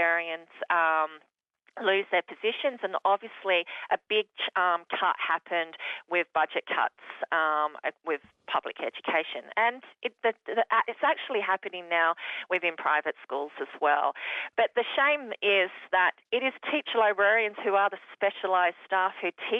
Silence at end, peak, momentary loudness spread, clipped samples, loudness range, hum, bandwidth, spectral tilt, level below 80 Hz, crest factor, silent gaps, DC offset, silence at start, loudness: 0 s; -12 dBFS; 9 LU; under 0.1%; 4 LU; none; 6.2 kHz; -4.5 dB/octave; -80 dBFS; 16 dB; none; under 0.1%; 0 s; -28 LUFS